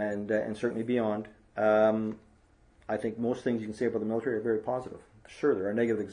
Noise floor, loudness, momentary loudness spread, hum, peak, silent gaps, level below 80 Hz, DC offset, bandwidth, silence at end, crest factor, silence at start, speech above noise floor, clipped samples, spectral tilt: -62 dBFS; -30 LUFS; 11 LU; none; -12 dBFS; none; -66 dBFS; under 0.1%; 10.5 kHz; 0 s; 18 dB; 0 s; 32 dB; under 0.1%; -7.5 dB/octave